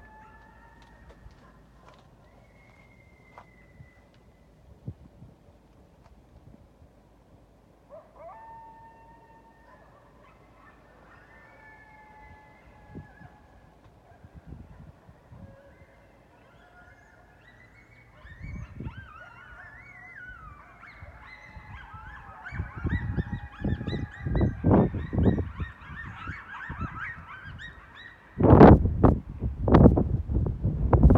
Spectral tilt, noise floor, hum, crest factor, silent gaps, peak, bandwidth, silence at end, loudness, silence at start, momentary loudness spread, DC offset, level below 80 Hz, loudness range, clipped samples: -10.5 dB/octave; -58 dBFS; none; 28 dB; none; 0 dBFS; 5.4 kHz; 0 s; -24 LUFS; 4.85 s; 28 LU; under 0.1%; -36 dBFS; 28 LU; under 0.1%